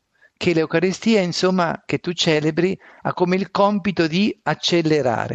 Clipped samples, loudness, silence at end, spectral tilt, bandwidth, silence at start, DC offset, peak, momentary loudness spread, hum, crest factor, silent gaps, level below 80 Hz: under 0.1%; -20 LUFS; 0 s; -5.5 dB/octave; 8.4 kHz; 0.4 s; under 0.1%; -4 dBFS; 6 LU; none; 16 dB; none; -58 dBFS